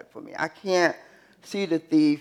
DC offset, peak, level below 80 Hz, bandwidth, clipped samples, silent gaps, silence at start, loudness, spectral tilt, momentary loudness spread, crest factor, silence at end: under 0.1%; -6 dBFS; -78 dBFS; 11.5 kHz; under 0.1%; none; 0.15 s; -25 LUFS; -5 dB/octave; 15 LU; 18 dB; 0 s